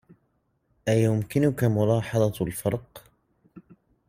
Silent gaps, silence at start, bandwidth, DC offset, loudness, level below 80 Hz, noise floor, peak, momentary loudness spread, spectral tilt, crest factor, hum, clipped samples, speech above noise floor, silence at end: none; 0.85 s; 16 kHz; under 0.1%; -25 LUFS; -56 dBFS; -71 dBFS; -10 dBFS; 7 LU; -7 dB/octave; 18 dB; none; under 0.1%; 47 dB; 0.5 s